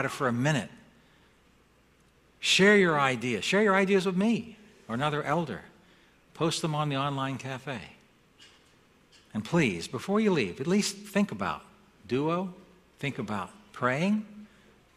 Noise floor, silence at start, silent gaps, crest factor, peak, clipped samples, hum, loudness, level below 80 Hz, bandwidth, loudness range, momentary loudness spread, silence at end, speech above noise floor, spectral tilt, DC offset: -63 dBFS; 0 s; none; 22 dB; -8 dBFS; under 0.1%; none; -28 LUFS; -64 dBFS; 14.5 kHz; 8 LU; 15 LU; 0.5 s; 35 dB; -5 dB/octave; under 0.1%